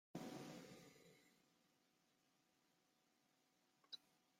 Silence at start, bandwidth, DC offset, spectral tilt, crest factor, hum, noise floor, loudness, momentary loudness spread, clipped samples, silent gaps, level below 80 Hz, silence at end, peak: 0.15 s; 16 kHz; under 0.1%; -4.5 dB/octave; 24 dB; none; -83 dBFS; -58 LUFS; 12 LU; under 0.1%; none; under -90 dBFS; 0 s; -38 dBFS